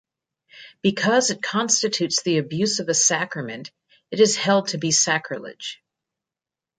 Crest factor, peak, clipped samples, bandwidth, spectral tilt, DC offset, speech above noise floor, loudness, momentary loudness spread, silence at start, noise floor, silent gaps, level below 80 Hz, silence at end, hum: 20 dB; -4 dBFS; under 0.1%; 10.5 kHz; -2.5 dB/octave; under 0.1%; 68 dB; -20 LUFS; 15 LU; 0.55 s; -89 dBFS; none; -68 dBFS; 1.05 s; none